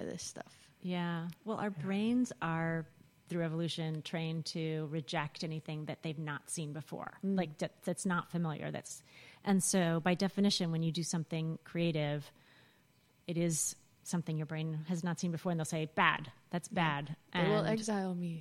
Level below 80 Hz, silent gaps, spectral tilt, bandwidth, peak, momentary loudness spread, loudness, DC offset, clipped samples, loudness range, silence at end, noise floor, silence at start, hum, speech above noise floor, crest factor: -72 dBFS; none; -5 dB/octave; 14.5 kHz; -12 dBFS; 11 LU; -36 LUFS; under 0.1%; under 0.1%; 5 LU; 0 s; -69 dBFS; 0 s; none; 33 dB; 24 dB